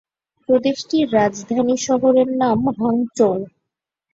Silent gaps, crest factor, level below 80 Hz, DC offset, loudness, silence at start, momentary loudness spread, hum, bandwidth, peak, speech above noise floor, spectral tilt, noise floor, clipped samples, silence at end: none; 16 dB; -58 dBFS; under 0.1%; -18 LUFS; 0.5 s; 5 LU; none; 8 kHz; -4 dBFS; 64 dB; -5.5 dB/octave; -82 dBFS; under 0.1%; 0.65 s